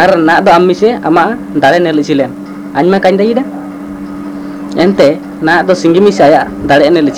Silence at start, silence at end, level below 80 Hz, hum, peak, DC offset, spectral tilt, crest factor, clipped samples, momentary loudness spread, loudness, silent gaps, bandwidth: 0 s; 0 s; -42 dBFS; none; 0 dBFS; 0.2%; -6 dB/octave; 8 dB; 1%; 16 LU; -9 LUFS; none; 15 kHz